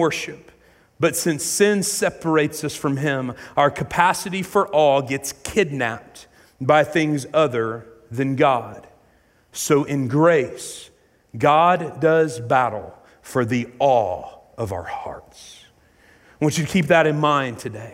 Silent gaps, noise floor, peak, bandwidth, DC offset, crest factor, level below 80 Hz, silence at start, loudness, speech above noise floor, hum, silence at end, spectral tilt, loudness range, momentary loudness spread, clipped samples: none; -58 dBFS; -2 dBFS; 16 kHz; under 0.1%; 18 dB; -56 dBFS; 0 s; -20 LUFS; 38 dB; none; 0 s; -4.5 dB/octave; 4 LU; 15 LU; under 0.1%